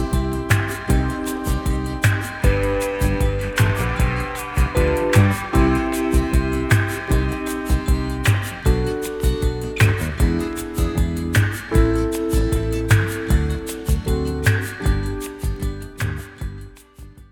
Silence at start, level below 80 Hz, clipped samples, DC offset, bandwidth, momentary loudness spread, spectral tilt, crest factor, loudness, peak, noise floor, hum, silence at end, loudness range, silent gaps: 0 s; -24 dBFS; under 0.1%; under 0.1%; 19.5 kHz; 8 LU; -6 dB/octave; 16 dB; -21 LUFS; -2 dBFS; -42 dBFS; none; 0.05 s; 3 LU; none